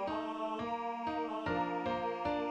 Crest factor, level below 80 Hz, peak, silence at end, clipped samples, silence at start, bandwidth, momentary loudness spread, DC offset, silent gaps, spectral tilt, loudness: 12 dB; -62 dBFS; -24 dBFS; 0 s; under 0.1%; 0 s; 8.6 kHz; 3 LU; under 0.1%; none; -6.5 dB/octave; -37 LUFS